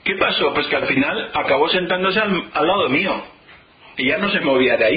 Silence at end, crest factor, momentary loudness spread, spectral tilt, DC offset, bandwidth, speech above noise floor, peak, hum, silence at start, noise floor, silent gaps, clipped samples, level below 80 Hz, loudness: 0 s; 14 dB; 5 LU; -10 dB/octave; under 0.1%; 5 kHz; 29 dB; -4 dBFS; none; 0.05 s; -47 dBFS; none; under 0.1%; -50 dBFS; -18 LUFS